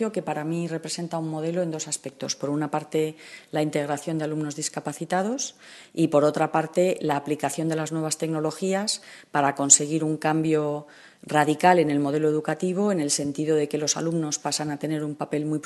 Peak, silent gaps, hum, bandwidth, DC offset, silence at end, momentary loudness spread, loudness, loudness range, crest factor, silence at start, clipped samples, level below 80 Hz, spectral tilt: -2 dBFS; none; none; 12.5 kHz; under 0.1%; 0.05 s; 10 LU; -25 LUFS; 7 LU; 24 dB; 0 s; under 0.1%; -72 dBFS; -4 dB/octave